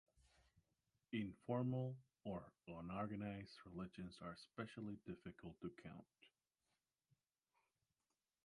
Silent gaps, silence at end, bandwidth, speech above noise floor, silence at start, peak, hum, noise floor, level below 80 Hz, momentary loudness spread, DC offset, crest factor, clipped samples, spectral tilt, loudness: none; 2.2 s; 11 kHz; over 40 dB; 1.1 s; -30 dBFS; none; under -90 dBFS; -76 dBFS; 12 LU; under 0.1%; 22 dB; under 0.1%; -8 dB/octave; -51 LUFS